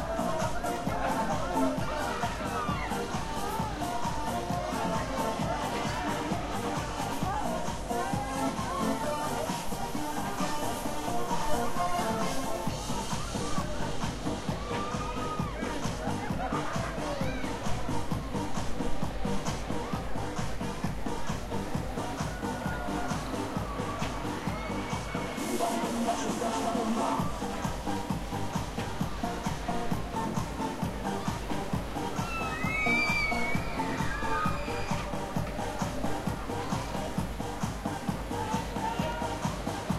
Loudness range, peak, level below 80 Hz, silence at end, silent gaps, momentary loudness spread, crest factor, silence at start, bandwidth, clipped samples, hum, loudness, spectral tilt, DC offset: 4 LU; -16 dBFS; -44 dBFS; 0 s; none; 4 LU; 16 dB; 0 s; 16 kHz; under 0.1%; none; -33 LUFS; -5 dB/octave; under 0.1%